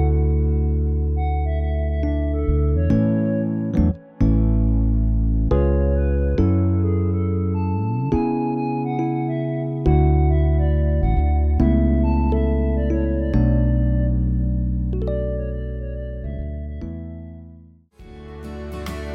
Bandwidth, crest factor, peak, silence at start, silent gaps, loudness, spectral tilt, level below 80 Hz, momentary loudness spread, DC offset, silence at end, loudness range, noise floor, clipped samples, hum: 4.4 kHz; 14 dB; -6 dBFS; 0 s; none; -21 LUFS; -10.5 dB/octave; -22 dBFS; 12 LU; under 0.1%; 0 s; 8 LU; -46 dBFS; under 0.1%; none